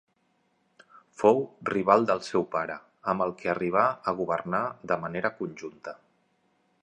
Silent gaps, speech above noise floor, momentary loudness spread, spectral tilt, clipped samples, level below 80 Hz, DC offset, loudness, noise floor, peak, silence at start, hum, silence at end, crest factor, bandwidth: none; 44 dB; 14 LU; -6.5 dB/octave; under 0.1%; -66 dBFS; under 0.1%; -27 LUFS; -71 dBFS; -6 dBFS; 1.2 s; none; 0.9 s; 24 dB; 10 kHz